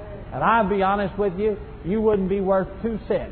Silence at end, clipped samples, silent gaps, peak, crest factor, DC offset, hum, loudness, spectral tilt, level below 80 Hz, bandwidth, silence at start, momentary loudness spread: 0 s; under 0.1%; none; -6 dBFS; 16 dB; under 0.1%; none; -23 LUFS; -11 dB/octave; -40 dBFS; 4.5 kHz; 0 s; 9 LU